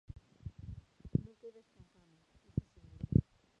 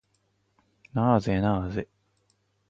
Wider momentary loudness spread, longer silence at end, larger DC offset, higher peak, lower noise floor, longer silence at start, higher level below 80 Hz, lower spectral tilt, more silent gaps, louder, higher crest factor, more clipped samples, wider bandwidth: first, 22 LU vs 12 LU; second, 0.4 s vs 0.85 s; neither; second, -12 dBFS vs -8 dBFS; about the same, -69 dBFS vs -72 dBFS; second, 0.45 s vs 0.95 s; about the same, -52 dBFS vs -48 dBFS; first, -11 dB/octave vs -8.5 dB/octave; neither; second, -38 LUFS vs -26 LUFS; first, 28 dB vs 22 dB; neither; second, 6.2 kHz vs 7.8 kHz